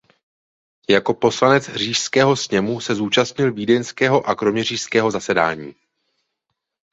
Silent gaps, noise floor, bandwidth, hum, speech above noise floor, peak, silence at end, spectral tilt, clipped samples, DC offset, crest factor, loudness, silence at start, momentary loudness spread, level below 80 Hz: none; -78 dBFS; 8 kHz; none; 60 dB; -2 dBFS; 1.2 s; -4 dB/octave; under 0.1%; under 0.1%; 18 dB; -18 LUFS; 0.9 s; 6 LU; -58 dBFS